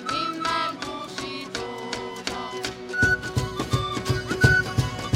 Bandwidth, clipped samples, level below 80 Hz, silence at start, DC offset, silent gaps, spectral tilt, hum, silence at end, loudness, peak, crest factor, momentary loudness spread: 16 kHz; under 0.1%; -42 dBFS; 0 s; under 0.1%; none; -4.5 dB/octave; none; 0 s; -26 LUFS; -4 dBFS; 22 dB; 12 LU